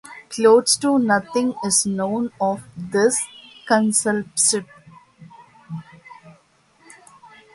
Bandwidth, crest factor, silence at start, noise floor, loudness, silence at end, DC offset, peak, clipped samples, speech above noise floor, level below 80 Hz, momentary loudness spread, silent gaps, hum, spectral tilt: 11.5 kHz; 18 dB; 0.05 s; -57 dBFS; -19 LUFS; 1.25 s; under 0.1%; -2 dBFS; under 0.1%; 38 dB; -64 dBFS; 18 LU; none; none; -3 dB/octave